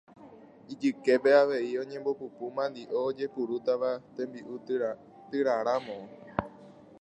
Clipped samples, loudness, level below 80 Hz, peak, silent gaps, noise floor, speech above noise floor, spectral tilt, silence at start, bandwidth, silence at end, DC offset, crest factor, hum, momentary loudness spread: under 0.1%; -30 LUFS; -64 dBFS; -8 dBFS; none; -52 dBFS; 23 dB; -6 dB/octave; 0.2 s; 8.8 kHz; 0.3 s; under 0.1%; 22 dB; none; 15 LU